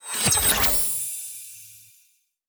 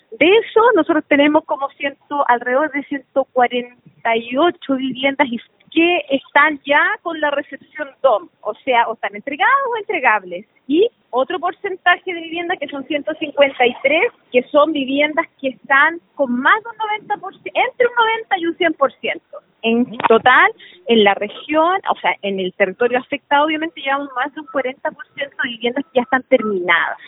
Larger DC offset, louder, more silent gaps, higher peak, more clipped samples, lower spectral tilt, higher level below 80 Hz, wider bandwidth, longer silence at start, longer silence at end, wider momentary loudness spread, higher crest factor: neither; second, -20 LUFS vs -17 LUFS; neither; second, -8 dBFS vs 0 dBFS; neither; second, -1 dB/octave vs -8 dB/octave; first, -42 dBFS vs -68 dBFS; first, over 20 kHz vs 4 kHz; about the same, 0.05 s vs 0.1 s; first, 0.7 s vs 0 s; first, 21 LU vs 11 LU; about the same, 18 dB vs 18 dB